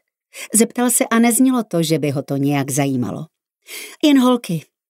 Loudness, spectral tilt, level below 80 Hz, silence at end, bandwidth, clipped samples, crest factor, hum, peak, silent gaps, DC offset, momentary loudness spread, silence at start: -17 LUFS; -4.5 dB/octave; -66 dBFS; 0.25 s; 16 kHz; under 0.1%; 18 dB; none; 0 dBFS; none; under 0.1%; 17 LU; 0.35 s